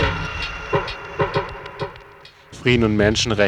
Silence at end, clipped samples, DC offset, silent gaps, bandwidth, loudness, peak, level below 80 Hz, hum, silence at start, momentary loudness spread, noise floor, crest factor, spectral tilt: 0 s; under 0.1%; under 0.1%; none; 11.5 kHz; -21 LUFS; -2 dBFS; -36 dBFS; none; 0 s; 15 LU; -45 dBFS; 20 dB; -5 dB/octave